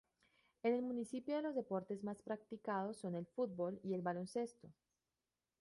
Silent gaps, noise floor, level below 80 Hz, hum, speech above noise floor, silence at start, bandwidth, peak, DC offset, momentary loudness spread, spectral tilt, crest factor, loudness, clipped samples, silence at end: none; under -90 dBFS; -84 dBFS; none; over 47 dB; 0.65 s; 11.5 kHz; -26 dBFS; under 0.1%; 6 LU; -7 dB/octave; 18 dB; -43 LUFS; under 0.1%; 0.9 s